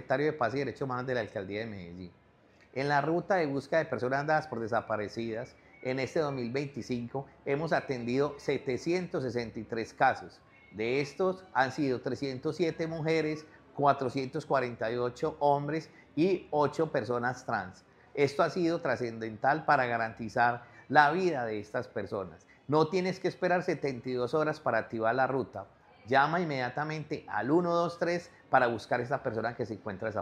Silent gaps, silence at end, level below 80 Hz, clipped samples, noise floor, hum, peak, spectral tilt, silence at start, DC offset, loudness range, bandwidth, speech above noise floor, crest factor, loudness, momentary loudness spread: none; 0 s; -66 dBFS; under 0.1%; -62 dBFS; none; -6 dBFS; -6.5 dB/octave; 0 s; under 0.1%; 4 LU; 10.5 kHz; 31 dB; 24 dB; -31 LUFS; 10 LU